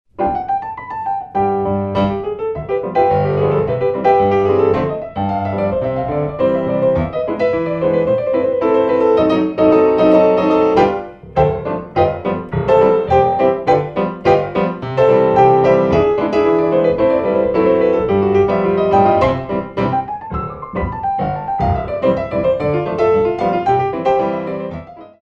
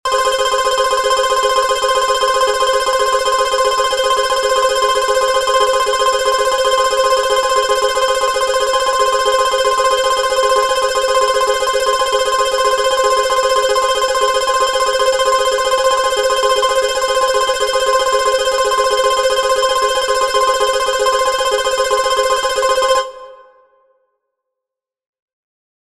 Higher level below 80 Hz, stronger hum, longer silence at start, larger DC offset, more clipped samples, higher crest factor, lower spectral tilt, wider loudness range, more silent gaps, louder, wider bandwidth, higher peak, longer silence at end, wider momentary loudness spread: about the same, -38 dBFS vs -42 dBFS; neither; first, 0.2 s vs 0.05 s; second, under 0.1% vs 0.8%; neither; about the same, 14 dB vs 14 dB; first, -8.5 dB/octave vs 0.5 dB/octave; about the same, 4 LU vs 2 LU; neither; about the same, -15 LUFS vs -14 LUFS; second, 7 kHz vs 15 kHz; about the same, 0 dBFS vs 0 dBFS; second, 0.15 s vs 2.55 s; first, 9 LU vs 1 LU